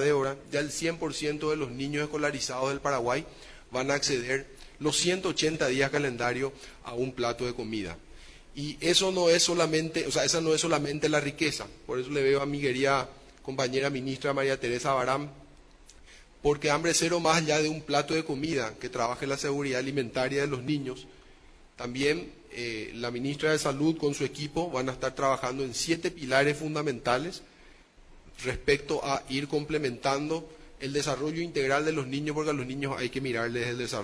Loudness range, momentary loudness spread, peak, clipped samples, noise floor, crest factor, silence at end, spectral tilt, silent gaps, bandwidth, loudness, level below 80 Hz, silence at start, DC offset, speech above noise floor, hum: 5 LU; 10 LU; -10 dBFS; under 0.1%; -55 dBFS; 20 dB; 0 s; -4 dB/octave; none; 11 kHz; -29 LUFS; -54 dBFS; 0 s; under 0.1%; 26 dB; none